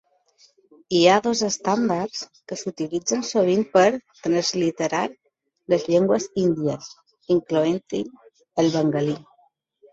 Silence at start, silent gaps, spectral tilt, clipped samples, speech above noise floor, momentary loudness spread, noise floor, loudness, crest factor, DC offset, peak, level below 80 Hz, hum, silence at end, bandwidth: 0.9 s; none; -4.5 dB/octave; under 0.1%; 41 dB; 12 LU; -62 dBFS; -22 LUFS; 20 dB; under 0.1%; -2 dBFS; -64 dBFS; none; 0.7 s; 8 kHz